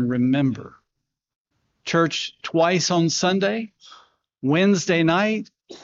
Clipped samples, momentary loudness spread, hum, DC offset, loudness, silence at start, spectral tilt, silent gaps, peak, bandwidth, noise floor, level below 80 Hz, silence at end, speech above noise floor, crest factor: under 0.1%; 11 LU; none; under 0.1%; -21 LUFS; 0 s; -4.5 dB/octave; 1.36-1.45 s; -8 dBFS; 7.8 kHz; -80 dBFS; -66 dBFS; 0.05 s; 60 dB; 16 dB